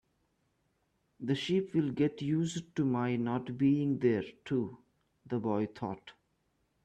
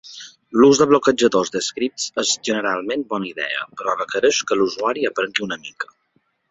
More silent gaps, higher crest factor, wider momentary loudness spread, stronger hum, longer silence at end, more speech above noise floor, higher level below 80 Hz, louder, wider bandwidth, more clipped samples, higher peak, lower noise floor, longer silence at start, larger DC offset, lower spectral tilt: neither; about the same, 18 dB vs 18 dB; second, 10 LU vs 14 LU; neither; about the same, 0.75 s vs 0.65 s; about the same, 45 dB vs 47 dB; second, -70 dBFS vs -60 dBFS; second, -33 LUFS vs -19 LUFS; about the same, 9 kHz vs 8.2 kHz; neither; second, -16 dBFS vs -2 dBFS; first, -77 dBFS vs -66 dBFS; first, 1.2 s vs 0.05 s; neither; first, -7 dB/octave vs -3 dB/octave